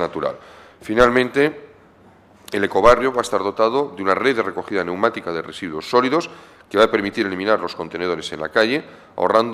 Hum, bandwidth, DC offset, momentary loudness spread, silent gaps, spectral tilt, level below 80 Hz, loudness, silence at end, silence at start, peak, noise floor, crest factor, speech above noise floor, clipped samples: none; 14 kHz; under 0.1%; 12 LU; none; -5 dB/octave; -44 dBFS; -19 LUFS; 0 s; 0 s; -2 dBFS; -49 dBFS; 18 dB; 30 dB; under 0.1%